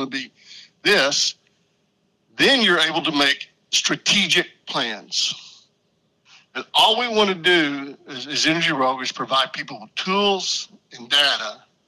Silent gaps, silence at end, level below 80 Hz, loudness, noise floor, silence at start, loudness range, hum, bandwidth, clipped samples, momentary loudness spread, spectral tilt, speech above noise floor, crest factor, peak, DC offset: none; 0.3 s; -68 dBFS; -19 LUFS; -67 dBFS; 0 s; 3 LU; none; 14 kHz; under 0.1%; 15 LU; -2 dB/octave; 46 dB; 16 dB; -6 dBFS; under 0.1%